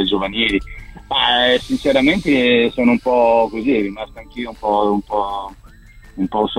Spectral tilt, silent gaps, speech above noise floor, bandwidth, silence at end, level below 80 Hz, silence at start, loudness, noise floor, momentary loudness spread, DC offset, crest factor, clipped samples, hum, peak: -5 dB/octave; none; 25 dB; 12.5 kHz; 0 s; -40 dBFS; 0 s; -16 LUFS; -42 dBFS; 16 LU; under 0.1%; 16 dB; under 0.1%; none; 0 dBFS